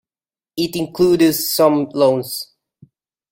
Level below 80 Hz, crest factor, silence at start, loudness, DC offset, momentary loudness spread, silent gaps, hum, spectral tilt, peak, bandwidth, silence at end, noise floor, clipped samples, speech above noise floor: -56 dBFS; 16 dB; 0.55 s; -16 LUFS; under 0.1%; 14 LU; none; none; -4.5 dB/octave; -2 dBFS; 16.5 kHz; 0.9 s; under -90 dBFS; under 0.1%; over 74 dB